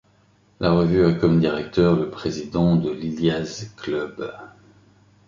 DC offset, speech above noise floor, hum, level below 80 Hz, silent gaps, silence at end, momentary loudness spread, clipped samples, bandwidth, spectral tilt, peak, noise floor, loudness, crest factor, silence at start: under 0.1%; 38 dB; 50 Hz at -50 dBFS; -46 dBFS; none; 0.8 s; 14 LU; under 0.1%; 7.4 kHz; -7.5 dB/octave; -4 dBFS; -58 dBFS; -21 LUFS; 18 dB; 0.6 s